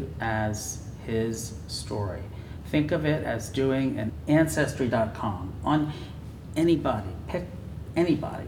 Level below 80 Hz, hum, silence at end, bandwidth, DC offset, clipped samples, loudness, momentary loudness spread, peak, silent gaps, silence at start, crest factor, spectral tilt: -44 dBFS; none; 0 s; 18.5 kHz; under 0.1%; under 0.1%; -28 LUFS; 13 LU; -10 dBFS; none; 0 s; 18 dB; -6 dB/octave